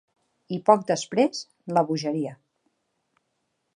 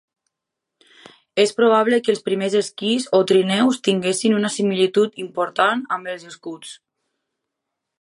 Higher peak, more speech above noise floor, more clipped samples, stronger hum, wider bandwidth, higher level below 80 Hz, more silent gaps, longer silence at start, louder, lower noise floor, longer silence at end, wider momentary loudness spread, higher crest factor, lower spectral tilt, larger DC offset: about the same, -4 dBFS vs -4 dBFS; second, 52 dB vs 64 dB; neither; neither; about the same, 10.5 kHz vs 11.5 kHz; about the same, -76 dBFS vs -74 dBFS; neither; second, 0.5 s vs 1.35 s; second, -24 LUFS vs -19 LUFS; second, -76 dBFS vs -82 dBFS; first, 1.45 s vs 1.25 s; about the same, 14 LU vs 16 LU; first, 24 dB vs 18 dB; about the same, -5.5 dB/octave vs -4.5 dB/octave; neither